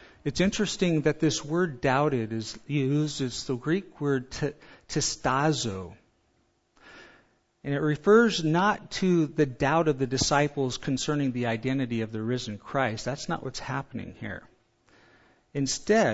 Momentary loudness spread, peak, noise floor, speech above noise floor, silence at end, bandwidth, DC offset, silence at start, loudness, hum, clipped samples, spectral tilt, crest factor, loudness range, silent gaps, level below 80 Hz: 10 LU; -8 dBFS; -70 dBFS; 43 dB; 0 s; 8 kHz; under 0.1%; 0.25 s; -27 LUFS; none; under 0.1%; -5 dB/octave; 20 dB; 7 LU; none; -54 dBFS